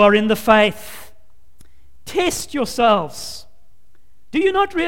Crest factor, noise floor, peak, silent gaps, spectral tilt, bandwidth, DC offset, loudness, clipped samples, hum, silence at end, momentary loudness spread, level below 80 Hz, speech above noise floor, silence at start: 18 dB; -57 dBFS; 0 dBFS; none; -4 dB/octave; 17 kHz; 2%; -17 LUFS; under 0.1%; none; 0 s; 20 LU; -46 dBFS; 41 dB; 0 s